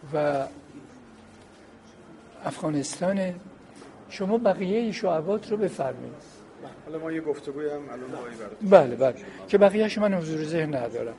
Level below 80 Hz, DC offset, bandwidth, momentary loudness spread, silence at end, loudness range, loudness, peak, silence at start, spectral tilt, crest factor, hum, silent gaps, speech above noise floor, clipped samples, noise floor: -64 dBFS; under 0.1%; 11.5 kHz; 21 LU; 0 s; 10 LU; -26 LUFS; 0 dBFS; 0 s; -6 dB/octave; 26 dB; none; none; 25 dB; under 0.1%; -50 dBFS